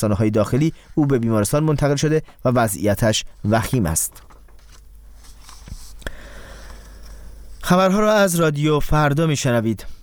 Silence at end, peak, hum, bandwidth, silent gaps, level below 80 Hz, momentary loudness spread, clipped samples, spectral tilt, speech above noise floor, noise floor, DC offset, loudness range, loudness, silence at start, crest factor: 0.05 s; -2 dBFS; none; 20 kHz; none; -36 dBFS; 21 LU; under 0.1%; -5.5 dB/octave; 25 dB; -43 dBFS; under 0.1%; 15 LU; -19 LUFS; 0 s; 18 dB